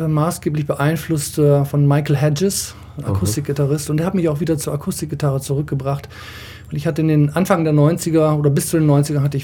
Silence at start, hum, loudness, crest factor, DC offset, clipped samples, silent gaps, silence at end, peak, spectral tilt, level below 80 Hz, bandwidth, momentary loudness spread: 0 s; none; -18 LUFS; 16 dB; under 0.1%; under 0.1%; none; 0 s; -2 dBFS; -6.5 dB/octave; -44 dBFS; 17.5 kHz; 9 LU